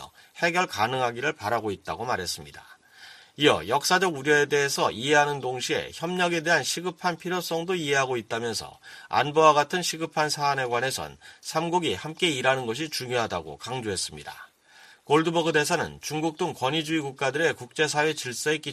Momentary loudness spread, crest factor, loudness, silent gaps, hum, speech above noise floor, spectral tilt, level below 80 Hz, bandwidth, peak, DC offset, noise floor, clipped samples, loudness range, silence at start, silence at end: 11 LU; 22 dB; -25 LUFS; none; none; 28 dB; -3.5 dB/octave; -62 dBFS; 15 kHz; -4 dBFS; under 0.1%; -54 dBFS; under 0.1%; 4 LU; 0 s; 0 s